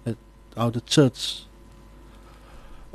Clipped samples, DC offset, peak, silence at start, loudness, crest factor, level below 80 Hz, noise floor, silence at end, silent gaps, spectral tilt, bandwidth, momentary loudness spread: under 0.1%; under 0.1%; -4 dBFS; 0.05 s; -24 LUFS; 22 dB; -50 dBFS; -48 dBFS; 0.05 s; none; -5.5 dB/octave; 13 kHz; 18 LU